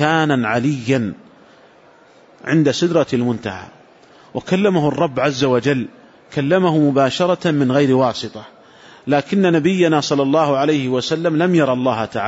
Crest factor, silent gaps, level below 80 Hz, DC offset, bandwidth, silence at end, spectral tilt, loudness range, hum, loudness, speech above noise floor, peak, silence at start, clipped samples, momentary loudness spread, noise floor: 14 dB; none; -58 dBFS; under 0.1%; 8 kHz; 0 s; -6 dB/octave; 4 LU; none; -17 LUFS; 32 dB; -4 dBFS; 0 s; under 0.1%; 12 LU; -48 dBFS